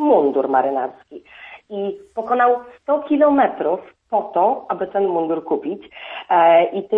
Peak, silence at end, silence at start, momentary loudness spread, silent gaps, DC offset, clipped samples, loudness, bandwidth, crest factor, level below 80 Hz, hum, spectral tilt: -4 dBFS; 0 s; 0 s; 17 LU; none; under 0.1%; under 0.1%; -19 LUFS; 4 kHz; 14 dB; -64 dBFS; none; -8 dB/octave